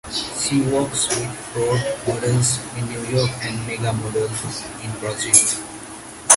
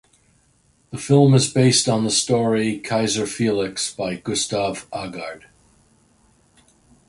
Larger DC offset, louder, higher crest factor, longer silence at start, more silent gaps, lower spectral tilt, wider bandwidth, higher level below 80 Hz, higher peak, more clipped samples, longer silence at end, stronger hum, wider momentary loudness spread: neither; about the same, -20 LUFS vs -19 LUFS; about the same, 22 dB vs 18 dB; second, 0.05 s vs 0.9 s; neither; about the same, -3.5 dB/octave vs -4.5 dB/octave; first, 16 kHz vs 11.5 kHz; first, -48 dBFS vs -56 dBFS; about the same, 0 dBFS vs -2 dBFS; neither; second, 0 s vs 1.7 s; neither; about the same, 14 LU vs 15 LU